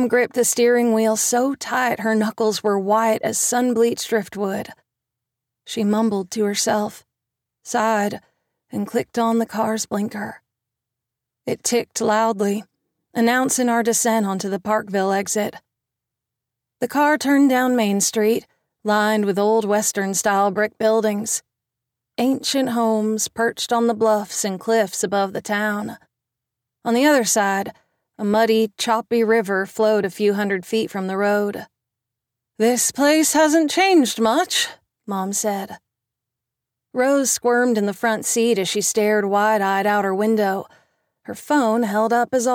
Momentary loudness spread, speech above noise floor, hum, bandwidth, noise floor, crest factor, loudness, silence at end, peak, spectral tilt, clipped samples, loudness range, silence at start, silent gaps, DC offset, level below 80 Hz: 9 LU; 65 dB; none; 17 kHz; -84 dBFS; 14 dB; -19 LUFS; 0 s; -6 dBFS; -3.5 dB/octave; under 0.1%; 5 LU; 0 s; none; under 0.1%; -68 dBFS